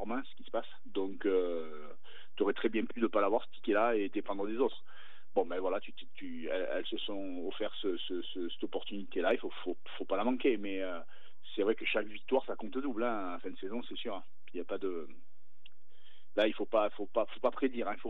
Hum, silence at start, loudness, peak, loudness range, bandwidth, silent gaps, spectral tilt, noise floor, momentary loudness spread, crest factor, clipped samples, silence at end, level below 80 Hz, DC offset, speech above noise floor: none; 0 s; -36 LUFS; -16 dBFS; 5 LU; 4.8 kHz; none; -7 dB/octave; -68 dBFS; 12 LU; 20 dB; under 0.1%; 0 s; under -90 dBFS; 2%; 32 dB